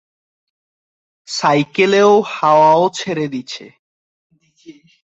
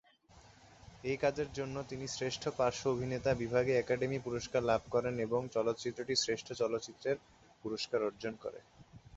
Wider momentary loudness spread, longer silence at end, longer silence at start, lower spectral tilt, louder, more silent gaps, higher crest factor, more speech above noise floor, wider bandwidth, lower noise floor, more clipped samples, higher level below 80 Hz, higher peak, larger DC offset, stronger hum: first, 15 LU vs 9 LU; first, 0.4 s vs 0 s; first, 1.3 s vs 0.35 s; about the same, -4.5 dB/octave vs -4 dB/octave; first, -14 LUFS vs -36 LUFS; first, 3.79-4.30 s vs none; about the same, 16 dB vs 18 dB; about the same, 29 dB vs 27 dB; about the same, 8 kHz vs 8 kHz; second, -43 dBFS vs -62 dBFS; neither; about the same, -62 dBFS vs -62 dBFS; first, -2 dBFS vs -18 dBFS; neither; neither